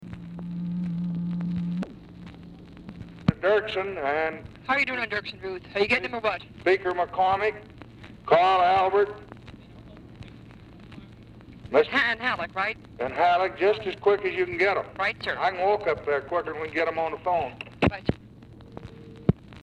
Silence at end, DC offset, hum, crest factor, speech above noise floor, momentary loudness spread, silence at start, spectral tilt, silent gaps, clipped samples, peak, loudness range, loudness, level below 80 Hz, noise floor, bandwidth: 0.05 s; under 0.1%; none; 20 dB; 22 dB; 23 LU; 0 s; -7 dB/octave; none; under 0.1%; -6 dBFS; 5 LU; -26 LUFS; -50 dBFS; -47 dBFS; 10 kHz